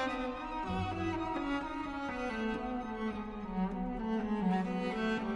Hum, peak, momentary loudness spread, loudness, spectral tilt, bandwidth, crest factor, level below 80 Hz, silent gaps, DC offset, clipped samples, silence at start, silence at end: none; -22 dBFS; 6 LU; -36 LUFS; -7 dB/octave; 10.5 kHz; 14 dB; -52 dBFS; none; under 0.1%; under 0.1%; 0 s; 0 s